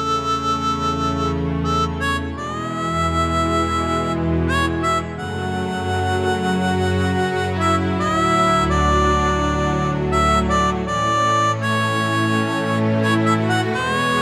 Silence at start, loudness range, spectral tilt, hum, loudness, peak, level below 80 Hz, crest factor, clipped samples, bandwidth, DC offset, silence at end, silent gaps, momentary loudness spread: 0 s; 3 LU; -5.5 dB/octave; none; -19 LUFS; -6 dBFS; -32 dBFS; 14 dB; under 0.1%; 13.5 kHz; under 0.1%; 0 s; none; 5 LU